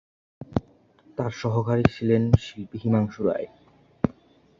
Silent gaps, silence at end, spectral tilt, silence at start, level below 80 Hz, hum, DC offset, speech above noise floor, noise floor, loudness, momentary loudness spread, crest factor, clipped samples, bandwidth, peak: none; 0.5 s; -8.5 dB/octave; 0.4 s; -44 dBFS; none; under 0.1%; 33 dB; -56 dBFS; -25 LUFS; 10 LU; 26 dB; under 0.1%; 7.4 kHz; 0 dBFS